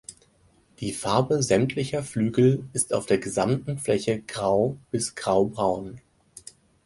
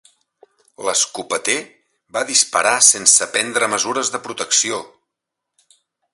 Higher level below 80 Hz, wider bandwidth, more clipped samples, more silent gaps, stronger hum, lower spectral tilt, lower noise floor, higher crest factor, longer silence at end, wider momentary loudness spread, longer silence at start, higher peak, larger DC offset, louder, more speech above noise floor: first, -56 dBFS vs -66 dBFS; second, 11.5 kHz vs 16 kHz; neither; neither; neither; first, -5.5 dB/octave vs 0.5 dB/octave; second, -61 dBFS vs -81 dBFS; about the same, 18 dB vs 20 dB; second, 0.85 s vs 1.25 s; about the same, 12 LU vs 14 LU; second, 0.1 s vs 0.8 s; second, -6 dBFS vs 0 dBFS; neither; second, -25 LUFS vs -16 LUFS; second, 37 dB vs 63 dB